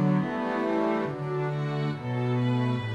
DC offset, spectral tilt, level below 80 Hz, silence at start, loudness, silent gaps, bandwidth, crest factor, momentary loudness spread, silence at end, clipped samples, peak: under 0.1%; -8.5 dB/octave; -66 dBFS; 0 s; -28 LUFS; none; 8.8 kHz; 12 dB; 4 LU; 0 s; under 0.1%; -14 dBFS